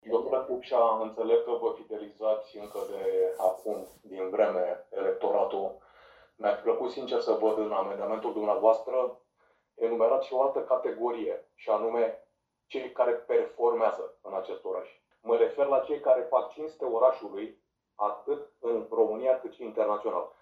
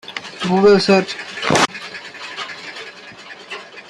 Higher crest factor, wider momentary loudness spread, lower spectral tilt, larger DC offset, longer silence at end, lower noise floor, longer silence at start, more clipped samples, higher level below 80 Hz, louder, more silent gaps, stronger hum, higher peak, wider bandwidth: about the same, 18 dB vs 18 dB; second, 12 LU vs 21 LU; about the same, -5.5 dB/octave vs -4.5 dB/octave; neither; about the same, 0.1 s vs 0.1 s; first, -70 dBFS vs -37 dBFS; about the same, 0.05 s vs 0.05 s; neither; second, -74 dBFS vs -58 dBFS; second, -29 LUFS vs -16 LUFS; neither; neither; second, -10 dBFS vs -2 dBFS; about the same, 13 kHz vs 12.5 kHz